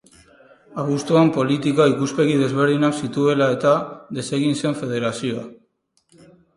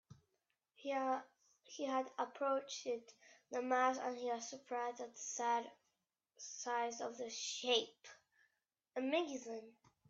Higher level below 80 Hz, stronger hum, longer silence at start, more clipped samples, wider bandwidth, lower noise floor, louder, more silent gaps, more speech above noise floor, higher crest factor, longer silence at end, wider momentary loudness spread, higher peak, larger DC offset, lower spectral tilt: first, -62 dBFS vs under -90 dBFS; neither; first, 0.7 s vs 0.1 s; neither; first, 11.5 kHz vs 8 kHz; second, -66 dBFS vs -88 dBFS; first, -20 LUFS vs -41 LUFS; neither; about the same, 47 dB vs 46 dB; second, 16 dB vs 22 dB; first, 1.05 s vs 0.4 s; second, 11 LU vs 14 LU; first, -4 dBFS vs -20 dBFS; neither; first, -6 dB/octave vs -1.5 dB/octave